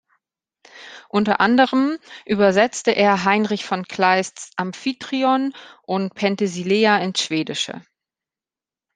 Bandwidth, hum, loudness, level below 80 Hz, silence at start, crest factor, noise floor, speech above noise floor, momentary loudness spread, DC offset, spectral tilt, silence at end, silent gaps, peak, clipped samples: 9.8 kHz; none; -19 LUFS; -66 dBFS; 0.75 s; 18 dB; under -90 dBFS; over 71 dB; 12 LU; under 0.1%; -4.5 dB/octave; 1.15 s; none; -2 dBFS; under 0.1%